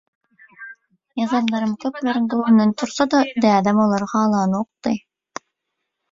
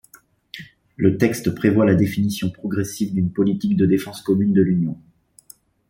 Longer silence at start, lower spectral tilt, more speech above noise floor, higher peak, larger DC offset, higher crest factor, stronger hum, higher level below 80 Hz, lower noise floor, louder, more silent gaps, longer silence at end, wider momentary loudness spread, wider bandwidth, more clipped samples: about the same, 0.6 s vs 0.55 s; about the same, -6 dB/octave vs -7 dB/octave; first, 60 dB vs 34 dB; about the same, -2 dBFS vs -2 dBFS; neither; about the same, 18 dB vs 18 dB; neither; second, -62 dBFS vs -54 dBFS; first, -78 dBFS vs -52 dBFS; about the same, -19 LUFS vs -20 LUFS; neither; first, 1.15 s vs 0.9 s; first, 21 LU vs 14 LU; second, 7.6 kHz vs 16.5 kHz; neither